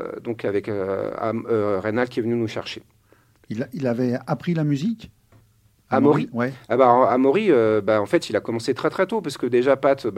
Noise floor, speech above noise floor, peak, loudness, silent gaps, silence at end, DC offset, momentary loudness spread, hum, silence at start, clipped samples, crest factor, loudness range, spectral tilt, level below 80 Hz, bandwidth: -59 dBFS; 38 dB; -2 dBFS; -22 LUFS; none; 0 s; under 0.1%; 10 LU; none; 0 s; under 0.1%; 20 dB; 7 LU; -7 dB/octave; -62 dBFS; 14 kHz